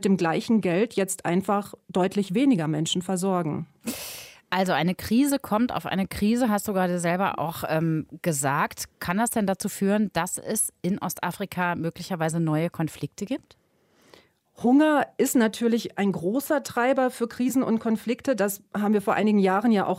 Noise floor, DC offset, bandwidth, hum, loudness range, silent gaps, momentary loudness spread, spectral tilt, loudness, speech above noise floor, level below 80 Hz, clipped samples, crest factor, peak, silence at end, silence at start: -62 dBFS; under 0.1%; 16 kHz; none; 4 LU; none; 8 LU; -5 dB/octave; -25 LUFS; 37 dB; -58 dBFS; under 0.1%; 16 dB; -10 dBFS; 0 s; 0 s